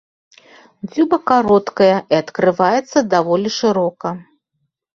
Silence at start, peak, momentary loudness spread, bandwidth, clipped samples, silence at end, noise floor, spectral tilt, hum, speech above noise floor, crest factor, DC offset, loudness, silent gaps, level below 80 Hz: 0.85 s; 0 dBFS; 13 LU; 7.4 kHz; under 0.1%; 0.75 s; -72 dBFS; -5.5 dB/octave; none; 56 dB; 16 dB; under 0.1%; -16 LUFS; none; -58 dBFS